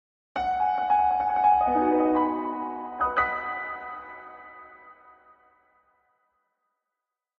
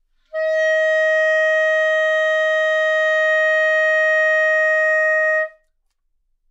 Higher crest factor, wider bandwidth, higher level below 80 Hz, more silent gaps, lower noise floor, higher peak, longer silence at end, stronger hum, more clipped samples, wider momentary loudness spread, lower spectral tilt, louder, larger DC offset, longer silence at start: first, 18 dB vs 8 dB; second, 6.4 kHz vs 8 kHz; first, -56 dBFS vs -66 dBFS; neither; first, -87 dBFS vs -67 dBFS; about the same, -10 dBFS vs -10 dBFS; first, 2.45 s vs 1 s; neither; neither; first, 21 LU vs 4 LU; first, -7 dB/octave vs 3 dB/octave; second, -25 LUFS vs -16 LUFS; neither; about the same, 0.35 s vs 0.35 s